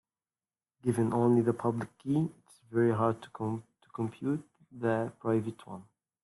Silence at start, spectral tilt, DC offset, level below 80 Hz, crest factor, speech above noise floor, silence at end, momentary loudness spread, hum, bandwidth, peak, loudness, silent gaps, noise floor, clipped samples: 0.85 s; -8.5 dB/octave; under 0.1%; -70 dBFS; 18 dB; over 60 dB; 0.4 s; 14 LU; none; 12 kHz; -14 dBFS; -32 LUFS; none; under -90 dBFS; under 0.1%